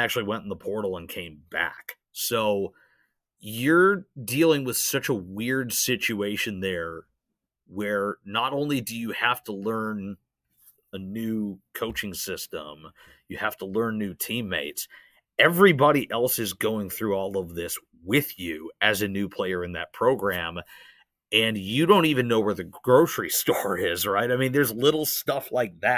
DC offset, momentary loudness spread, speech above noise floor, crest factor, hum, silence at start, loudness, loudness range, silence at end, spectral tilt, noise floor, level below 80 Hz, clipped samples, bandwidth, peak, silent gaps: under 0.1%; 14 LU; 58 dB; 22 dB; none; 0 s; -25 LUFS; 8 LU; 0 s; -4 dB/octave; -83 dBFS; -56 dBFS; under 0.1%; 16 kHz; -4 dBFS; none